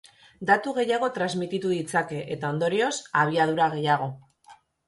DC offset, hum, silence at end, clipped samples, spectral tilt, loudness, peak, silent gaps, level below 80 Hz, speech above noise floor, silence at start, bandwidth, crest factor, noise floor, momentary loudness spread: under 0.1%; none; 0.35 s; under 0.1%; -5 dB/octave; -25 LUFS; -6 dBFS; none; -68 dBFS; 30 dB; 0.4 s; 11.5 kHz; 20 dB; -55 dBFS; 7 LU